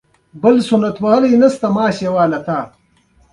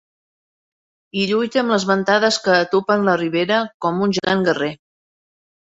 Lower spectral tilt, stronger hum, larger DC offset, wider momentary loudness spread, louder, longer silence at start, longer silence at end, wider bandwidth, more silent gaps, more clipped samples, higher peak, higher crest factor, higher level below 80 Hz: first, -7 dB/octave vs -4.5 dB/octave; neither; neither; first, 10 LU vs 7 LU; first, -14 LUFS vs -18 LUFS; second, 0.35 s vs 1.15 s; second, 0.65 s vs 0.9 s; first, 11.5 kHz vs 8 kHz; second, none vs 3.74-3.80 s; neither; about the same, 0 dBFS vs -2 dBFS; about the same, 14 dB vs 18 dB; first, -54 dBFS vs -60 dBFS